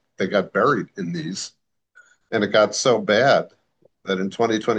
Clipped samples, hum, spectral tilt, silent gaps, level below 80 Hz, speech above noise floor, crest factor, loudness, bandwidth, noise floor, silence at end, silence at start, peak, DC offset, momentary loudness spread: under 0.1%; none; -4 dB/octave; none; -70 dBFS; 38 dB; 16 dB; -21 LUFS; 9.6 kHz; -58 dBFS; 0 s; 0.2 s; -4 dBFS; under 0.1%; 13 LU